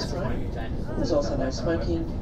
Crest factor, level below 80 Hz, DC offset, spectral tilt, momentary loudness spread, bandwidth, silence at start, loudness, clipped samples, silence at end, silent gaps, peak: 14 dB; -32 dBFS; under 0.1%; -6.5 dB/octave; 7 LU; 9.6 kHz; 0 s; -28 LUFS; under 0.1%; 0 s; none; -14 dBFS